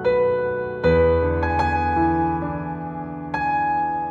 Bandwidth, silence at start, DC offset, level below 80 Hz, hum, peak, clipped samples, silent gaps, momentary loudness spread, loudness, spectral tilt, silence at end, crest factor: 7.4 kHz; 0 s; under 0.1%; -36 dBFS; none; -6 dBFS; under 0.1%; none; 11 LU; -21 LUFS; -8.5 dB/octave; 0 s; 14 dB